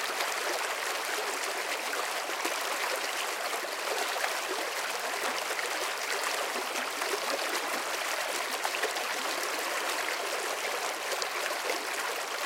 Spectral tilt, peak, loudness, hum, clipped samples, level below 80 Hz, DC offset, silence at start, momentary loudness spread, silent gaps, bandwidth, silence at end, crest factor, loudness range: 1 dB/octave; -12 dBFS; -31 LUFS; none; under 0.1%; -88 dBFS; under 0.1%; 0 s; 2 LU; none; 17 kHz; 0 s; 20 dB; 0 LU